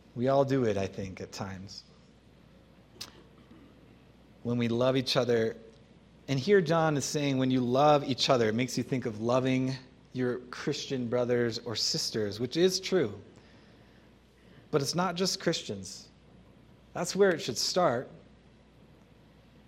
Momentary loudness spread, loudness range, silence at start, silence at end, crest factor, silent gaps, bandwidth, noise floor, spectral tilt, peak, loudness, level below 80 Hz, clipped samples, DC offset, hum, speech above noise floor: 17 LU; 8 LU; 0.15 s; 1.5 s; 20 dB; none; 16 kHz; -59 dBFS; -5 dB/octave; -10 dBFS; -29 LUFS; -64 dBFS; under 0.1%; under 0.1%; none; 30 dB